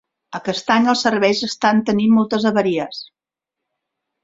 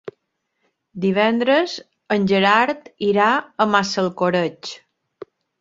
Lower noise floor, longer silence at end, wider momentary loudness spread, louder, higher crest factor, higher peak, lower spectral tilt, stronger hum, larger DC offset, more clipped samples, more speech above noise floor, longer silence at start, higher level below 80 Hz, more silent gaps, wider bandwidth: first, -85 dBFS vs -74 dBFS; first, 1.2 s vs 0.85 s; second, 12 LU vs 18 LU; about the same, -17 LUFS vs -19 LUFS; about the same, 18 dB vs 20 dB; about the same, -2 dBFS vs -2 dBFS; about the same, -5 dB/octave vs -5 dB/octave; neither; neither; neither; first, 68 dB vs 55 dB; first, 0.3 s vs 0.05 s; about the same, -60 dBFS vs -64 dBFS; neither; about the same, 7.8 kHz vs 7.8 kHz